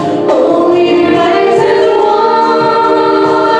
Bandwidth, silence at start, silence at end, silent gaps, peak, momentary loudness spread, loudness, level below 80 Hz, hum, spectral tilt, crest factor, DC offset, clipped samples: 9.8 kHz; 0 s; 0 s; none; 0 dBFS; 1 LU; -9 LUFS; -52 dBFS; none; -6 dB/octave; 8 dB; under 0.1%; under 0.1%